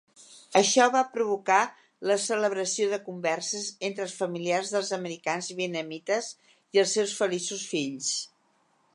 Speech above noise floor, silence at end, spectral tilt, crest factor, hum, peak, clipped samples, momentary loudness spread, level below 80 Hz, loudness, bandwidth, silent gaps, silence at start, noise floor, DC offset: 41 dB; 0.7 s; -2.5 dB/octave; 22 dB; none; -6 dBFS; under 0.1%; 9 LU; -84 dBFS; -27 LUFS; 11.5 kHz; none; 0.2 s; -68 dBFS; under 0.1%